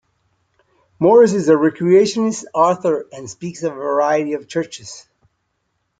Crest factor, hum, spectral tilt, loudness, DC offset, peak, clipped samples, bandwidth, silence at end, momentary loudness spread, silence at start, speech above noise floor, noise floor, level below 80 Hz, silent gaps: 16 dB; none; -5.5 dB/octave; -16 LUFS; under 0.1%; -2 dBFS; under 0.1%; 9.2 kHz; 1 s; 18 LU; 1 s; 54 dB; -70 dBFS; -62 dBFS; none